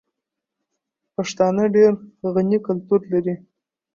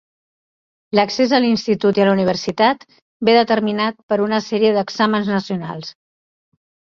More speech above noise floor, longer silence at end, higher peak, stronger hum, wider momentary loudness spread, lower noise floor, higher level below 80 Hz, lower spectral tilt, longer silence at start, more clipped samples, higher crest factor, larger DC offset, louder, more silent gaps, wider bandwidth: second, 64 dB vs over 73 dB; second, 0.6 s vs 1 s; second, -4 dBFS vs 0 dBFS; neither; about the same, 12 LU vs 10 LU; second, -83 dBFS vs under -90 dBFS; about the same, -64 dBFS vs -60 dBFS; first, -7 dB/octave vs -5.5 dB/octave; first, 1.2 s vs 0.95 s; neither; about the same, 16 dB vs 18 dB; neither; second, -20 LUFS vs -17 LUFS; second, none vs 3.02-3.20 s, 4.03-4.09 s; about the same, 7.4 kHz vs 7.4 kHz